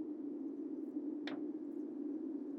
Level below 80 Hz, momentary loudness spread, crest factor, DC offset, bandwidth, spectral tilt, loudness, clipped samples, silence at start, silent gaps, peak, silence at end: under -90 dBFS; 2 LU; 16 dB; under 0.1%; 6 kHz; -7 dB/octave; -44 LUFS; under 0.1%; 0 s; none; -28 dBFS; 0 s